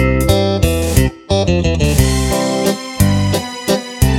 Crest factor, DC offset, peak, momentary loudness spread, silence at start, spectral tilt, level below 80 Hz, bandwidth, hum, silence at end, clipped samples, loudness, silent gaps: 14 dB; under 0.1%; 0 dBFS; 5 LU; 0 s; -5.5 dB/octave; -22 dBFS; 18 kHz; none; 0 s; under 0.1%; -15 LUFS; none